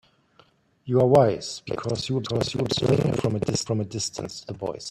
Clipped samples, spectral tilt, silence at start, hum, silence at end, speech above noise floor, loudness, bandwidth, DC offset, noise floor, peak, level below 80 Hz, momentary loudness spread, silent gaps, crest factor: under 0.1%; -5.5 dB/octave; 0.85 s; none; 0 s; 36 dB; -24 LUFS; 13.5 kHz; under 0.1%; -60 dBFS; -4 dBFS; -54 dBFS; 14 LU; none; 20 dB